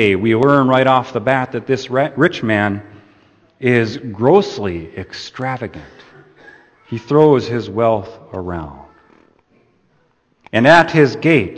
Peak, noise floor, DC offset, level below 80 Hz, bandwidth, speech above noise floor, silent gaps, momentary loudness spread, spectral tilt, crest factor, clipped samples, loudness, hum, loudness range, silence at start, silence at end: 0 dBFS; -59 dBFS; under 0.1%; -50 dBFS; 8.8 kHz; 44 dB; none; 17 LU; -7 dB/octave; 16 dB; under 0.1%; -15 LUFS; none; 4 LU; 0 s; 0 s